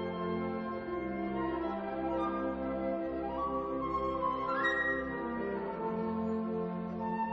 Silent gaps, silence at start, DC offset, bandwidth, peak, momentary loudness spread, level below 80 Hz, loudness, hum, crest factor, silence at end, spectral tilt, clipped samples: none; 0 s; under 0.1%; 7.6 kHz; -20 dBFS; 5 LU; -56 dBFS; -35 LUFS; none; 14 dB; 0 s; -5 dB/octave; under 0.1%